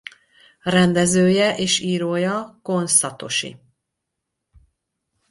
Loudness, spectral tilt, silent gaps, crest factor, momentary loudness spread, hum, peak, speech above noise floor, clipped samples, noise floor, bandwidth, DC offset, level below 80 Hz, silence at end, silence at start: -19 LUFS; -4 dB/octave; none; 20 dB; 11 LU; none; -2 dBFS; 61 dB; under 0.1%; -80 dBFS; 11.5 kHz; under 0.1%; -58 dBFS; 1.75 s; 0.65 s